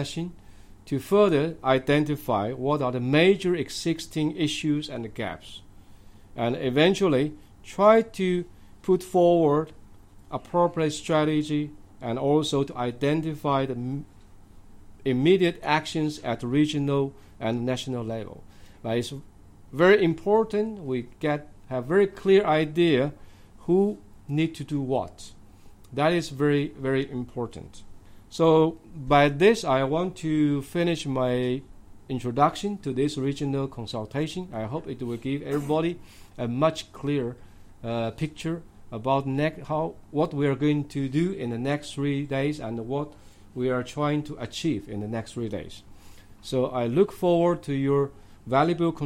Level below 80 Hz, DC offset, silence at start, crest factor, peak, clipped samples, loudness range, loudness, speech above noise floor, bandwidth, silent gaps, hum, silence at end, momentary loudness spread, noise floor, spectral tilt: -52 dBFS; under 0.1%; 0 s; 20 dB; -6 dBFS; under 0.1%; 6 LU; -25 LUFS; 23 dB; 16 kHz; none; none; 0 s; 14 LU; -48 dBFS; -6.5 dB/octave